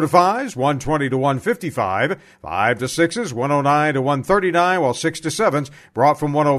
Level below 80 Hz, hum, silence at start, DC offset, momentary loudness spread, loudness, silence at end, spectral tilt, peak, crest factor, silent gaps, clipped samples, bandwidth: -48 dBFS; none; 0 s; under 0.1%; 6 LU; -19 LUFS; 0 s; -5.5 dB/octave; 0 dBFS; 18 dB; none; under 0.1%; 13.5 kHz